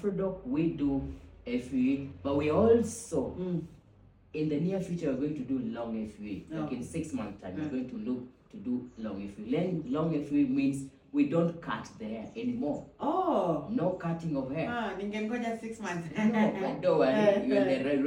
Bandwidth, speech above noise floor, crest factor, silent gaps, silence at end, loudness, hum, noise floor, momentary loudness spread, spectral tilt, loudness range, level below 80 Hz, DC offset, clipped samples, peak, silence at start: 16 kHz; 28 dB; 18 dB; none; 0 s; -31 LUFS; none; -59 dBFS; 12 LU; -7 dB/octave; 6 LU; -58 dBFS; under 0.1%; under 0.1%; -14 dBFS; 0 s